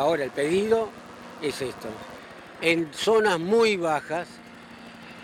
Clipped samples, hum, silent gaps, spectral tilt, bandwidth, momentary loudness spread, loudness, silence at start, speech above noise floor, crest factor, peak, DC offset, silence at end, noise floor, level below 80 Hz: under 0.1%; none; none; -4.5 dB/octave; 15.5 kHz; 22 LU; -25 LUFS; 0 s; 20 dB; 16 dB; -10 dBFS; under 0.1%; 0 s; -45 dBFS; -62 dBFS